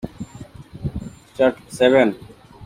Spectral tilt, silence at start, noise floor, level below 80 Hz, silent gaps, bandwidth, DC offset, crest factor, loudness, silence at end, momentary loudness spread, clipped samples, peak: -6 dB/octave; 0.05 s; -40 dBFS; -44 dBFS; none; 15 kHz; under 0.1%; 18 dB; -19 LUFS; 0 s; 22 LU; under 0.1%; -2 dBFS